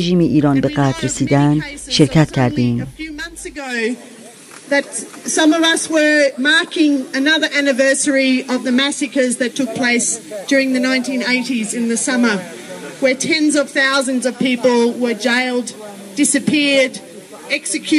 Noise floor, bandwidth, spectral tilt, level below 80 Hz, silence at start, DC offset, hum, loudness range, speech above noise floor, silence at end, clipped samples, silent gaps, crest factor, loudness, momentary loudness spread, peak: -38 dBFS; 14 kHz; -4 dB/octave; -48 dBFS; 0 s; under 0.1%; none; 4 LU; 22 dB; 0 s; under 0.1%; none; 16 dB; -15 LUFS; 11 LU; 0 dBFS